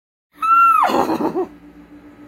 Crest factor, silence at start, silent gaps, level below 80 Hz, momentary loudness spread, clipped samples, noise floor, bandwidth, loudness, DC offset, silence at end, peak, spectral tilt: 16 dB; 0.4 s; none; -56 dBFS; 14 LU; under 0.1%; -42 dBFS; 16 kHz; -15 LUFS; under 0.1%; 0.3 s; -2 dBFS; -5 dB/octave